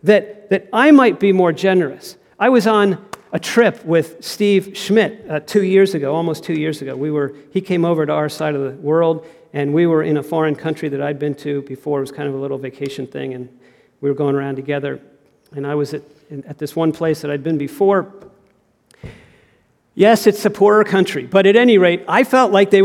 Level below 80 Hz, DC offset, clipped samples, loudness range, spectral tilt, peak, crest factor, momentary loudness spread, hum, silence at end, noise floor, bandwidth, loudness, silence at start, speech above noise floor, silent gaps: -62 dBFS; under 0.1%; under 0.1%; 9 LU; -6 dB/octave; 0 dBFS; 16 dB; 15 LU; none; 0 s; -58 dBFS; 16 kHz; -16 LUFS; 0.05 s; 42 dB; none